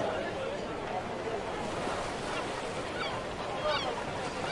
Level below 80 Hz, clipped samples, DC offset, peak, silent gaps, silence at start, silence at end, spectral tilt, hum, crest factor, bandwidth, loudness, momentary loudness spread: -54 dBFS; under 0.1%; under 0.1%; -20 dBFS; none; 0 s; 0 s; -4 dB/octave; none; 14 dB; 11.5 kHz; -35 LUFS; 4 LU